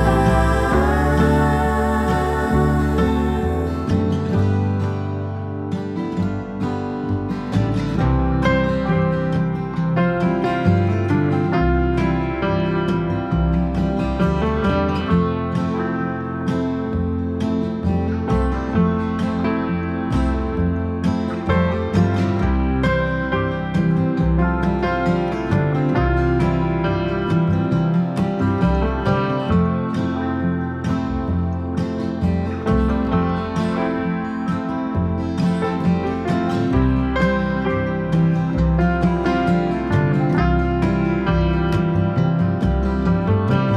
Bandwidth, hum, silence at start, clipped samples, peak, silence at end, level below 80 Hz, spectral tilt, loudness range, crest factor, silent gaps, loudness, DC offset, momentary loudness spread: 11 kHz; none; 0 s; under 0.1%; -4 dBFS; 0 s; -28 dBFS; -8.5 dB/octave; 3 LU; 14 dB; none; -20 LUFS; under 0.1%; 5 LU